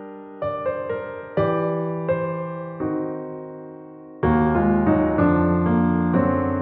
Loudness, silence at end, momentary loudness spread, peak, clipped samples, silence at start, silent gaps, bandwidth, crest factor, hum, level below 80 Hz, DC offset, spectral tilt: -22 LUFS; 0 s; 16 LU; -6 dBFS; under 0.1%; 0 s; none; 4.1 kHz; 14 dB; none; -42 dBFS; under 0.1%; -8.5 dB/octave